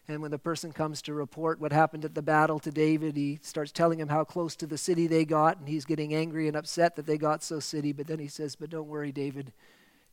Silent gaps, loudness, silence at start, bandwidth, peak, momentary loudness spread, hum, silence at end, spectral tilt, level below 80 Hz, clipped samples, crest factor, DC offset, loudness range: none; -30 LUFS; 0.1 s; 16.5 kHz; -10 dBFS; 11 LU; none; 0.6 s; -5.5 dB/octave; -74 dBFS; under 0.1%; 20 dB; under 0.1%; 3 LU